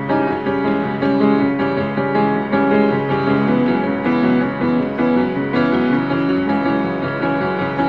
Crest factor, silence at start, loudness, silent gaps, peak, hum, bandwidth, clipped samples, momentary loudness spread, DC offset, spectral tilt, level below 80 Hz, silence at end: 14 dB; 0 s; -17 LUFS; none; -2 dBFS; none; 5.4 kHz; under 0.1%; 4 LU; 0.3%; -9 dB/octave; -50 dBFS; 0 s